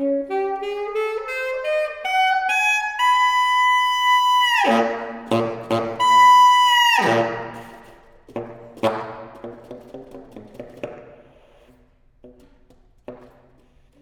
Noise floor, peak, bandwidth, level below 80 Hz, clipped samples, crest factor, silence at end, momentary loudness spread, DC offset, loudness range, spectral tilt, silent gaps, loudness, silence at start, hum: -55 dBFS; -4 dBFS; 20 kHz; -56 dBFS; under 0.1%; 16 dB; 0.85 s; 24 LU; under 0.1%; 16 LU; -3 dB/octave; none; -18 LUFS; 0 s; none